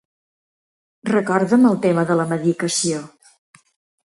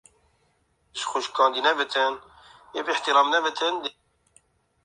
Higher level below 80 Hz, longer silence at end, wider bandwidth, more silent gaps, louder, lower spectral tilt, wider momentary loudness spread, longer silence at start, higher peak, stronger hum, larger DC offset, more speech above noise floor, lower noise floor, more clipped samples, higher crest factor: first, -66 dBFS vs -72 dBFS; about the same, 1.05 s vs 0.95 s; about the same, 11.5 kHz vs 11.5 kHz; neither; first, -18 LUFS vs -24 LUFS; first, -5 dB/octave vs -0.5 dB/octave; second, 8 LU vs 15 LU; about the same, 1.05 s vs 0.95 s; about the same, -4 dBFS vs -4 dBFS; neither; neither; first, over 73 dB vs 44 dB; first, under -90 dBFS vs -68 dBFS; neither; about the same, 18 dB vs 22 dB